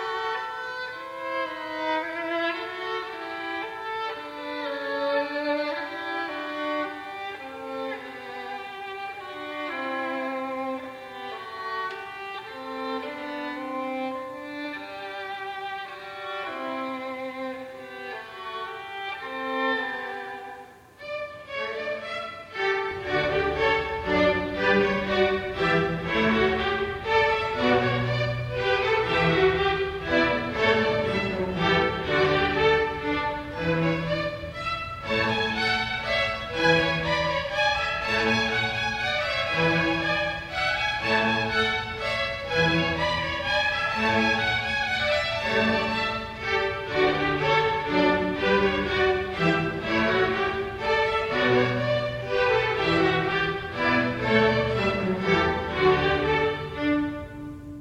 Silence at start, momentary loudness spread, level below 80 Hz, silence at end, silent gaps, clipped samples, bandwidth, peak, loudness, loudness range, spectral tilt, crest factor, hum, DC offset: 0 s; 13 LU; -48 dBFS; 0 s; none; under 0.1%; 14 kHz; -6 dBFS; -25 LUFS; 10 LU; -5.5 dB/octave; 20 dB; none; under 0.1%